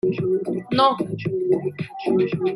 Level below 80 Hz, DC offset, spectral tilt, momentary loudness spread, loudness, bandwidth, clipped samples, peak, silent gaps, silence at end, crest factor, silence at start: -60 dBFS; under 0.1%; -8 dB/octave; 7 LU; -22 LUFS; 11 kHz; under 0.1%; -2 dBFS; none; 0 s; 18 dB; 0.05 s